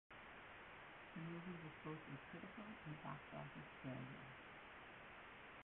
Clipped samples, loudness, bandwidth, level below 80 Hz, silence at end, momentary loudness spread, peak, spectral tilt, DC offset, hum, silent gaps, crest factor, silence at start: under 0.1%; -55 LUFS; 4 kHz; -76 dBFS; 0 s; 6 LU; -38 dBFS; -4.5 dB/octave; under 0.1%; none; none; 18 dB; 0.1 s